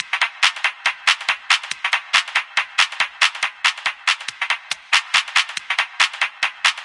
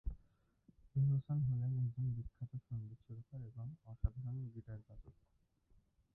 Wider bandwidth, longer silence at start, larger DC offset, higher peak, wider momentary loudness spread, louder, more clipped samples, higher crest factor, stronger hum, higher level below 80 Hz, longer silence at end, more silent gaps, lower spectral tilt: first, 11.5 kHz vs 1.7 kHz; about the same, 0 s vs 0.05 s; neither; first, 0 dBFS vs -24 dBFS; second, 5 LU vs 18 LU; first, -18 LUFS vs -42 LUFS; neither; about the same, 20 dB vs 20 dB; neither; second, -76 dBFS vs -54 dBFS; second, 0 s vs 1.05 s; neither; second, 3.5 dB/octave vs -13.5 dB/octave